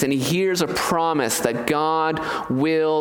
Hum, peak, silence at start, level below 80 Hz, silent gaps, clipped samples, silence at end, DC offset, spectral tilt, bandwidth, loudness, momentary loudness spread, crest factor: none; -4 dBFS; 0 s; -54 dBFS; none; under 0.1%; 0 s; under 0.1%; -4.5 dB/octave; 19 kHz; -21 LUFS; 3 LU; 16 dB